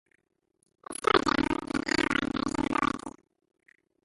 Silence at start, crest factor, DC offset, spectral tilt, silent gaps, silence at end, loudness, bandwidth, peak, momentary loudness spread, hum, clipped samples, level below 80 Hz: 0.9 s; 24 dB; under 0.1%; -4 dB/octave; none; 0.95 s; -28 LUFS; 11.5 kHz; -6 dBFS; 11 LU; none; under 0.1%; -52 dBFS